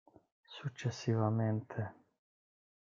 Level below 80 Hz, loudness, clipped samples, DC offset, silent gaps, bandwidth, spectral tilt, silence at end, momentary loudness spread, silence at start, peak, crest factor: -78 dBFS; -37 LUFS; under 0.1%; under 0.1%; none; 7.4 kHz; -7 dB/octave; 1.05 s; 13 LU; 0.5 s; -18 dBFS; 20 dB